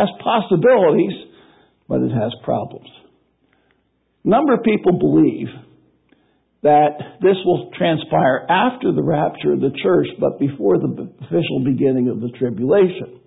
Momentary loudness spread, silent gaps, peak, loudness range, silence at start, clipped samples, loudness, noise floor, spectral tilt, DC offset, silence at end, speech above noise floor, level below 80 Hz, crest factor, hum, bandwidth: 9 LU; none; -4 dBFS; 4 LU; 0 s; under 0.1%; -17 LUFS; -65 dBFS; -12 dB/octave; under 0.1%; 0.15 s; 48 dB; -56 dBFS; 14 dB; none; 4 kHz